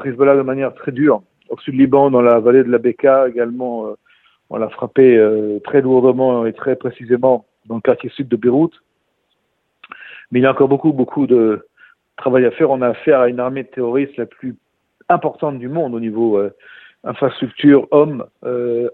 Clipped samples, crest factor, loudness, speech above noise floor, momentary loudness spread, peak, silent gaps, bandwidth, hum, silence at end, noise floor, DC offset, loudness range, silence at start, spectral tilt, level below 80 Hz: under 0.1%; 16 dB; -15 LUFS; 53 dB; 13 LU; 0 dBFS; none; 4.1 kHz; none; 0 s; -67 dBFS; under 0.1%; 6 LU; 0 s; -10.5 dB/octave; -62 dBFS